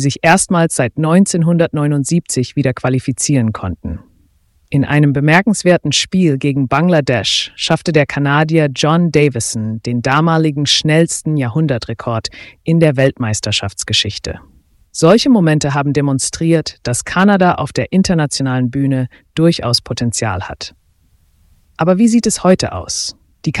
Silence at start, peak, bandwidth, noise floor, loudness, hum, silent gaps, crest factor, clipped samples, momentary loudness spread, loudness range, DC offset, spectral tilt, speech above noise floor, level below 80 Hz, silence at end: 0 s; 0 dBFS; 12 kHz; -54 dBFS; -14 LUFS; none; none; 14 dB; under 0.1%; 9 LU; 4 LU; under 0.1%; -5 dB/octave; 41 dB; -42 dBFS; 0 s